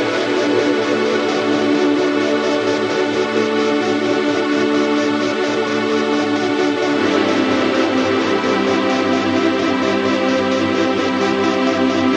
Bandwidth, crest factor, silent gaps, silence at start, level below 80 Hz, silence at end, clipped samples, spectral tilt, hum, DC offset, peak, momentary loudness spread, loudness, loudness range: 9.8 kHz; 14 dB; none; 0 s; -60 dBFS; 0 s; under 0.1%; -4.5 dB/octave; none; under 0.1%; -2 dBFS; 2 LU; -16 LUFS; 1 LU